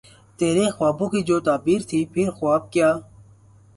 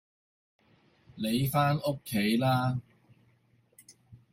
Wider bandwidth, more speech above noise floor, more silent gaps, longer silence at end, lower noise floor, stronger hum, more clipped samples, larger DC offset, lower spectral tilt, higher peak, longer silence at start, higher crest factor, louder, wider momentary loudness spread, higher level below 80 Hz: second, 11.5 kHz vs 16.5 kHz; second, 30 dB vs 39 dB; neither; first, 0.75 s vs 0.15 s; second, -51 dBFS vs -67 dBFS; neither; neither; neither; about the same, -6 dB/octave vs -6 dB/octave; first, -6 dBFS vs -12 dBFS; second, 0.4 s vs 1.15 s; about the same, 16 dB vs 20 dB; first, -21 LUFS vs -29 LUFS; second, 4 LU vs 7 LU; first, -56 dBFS vs -62 dBFS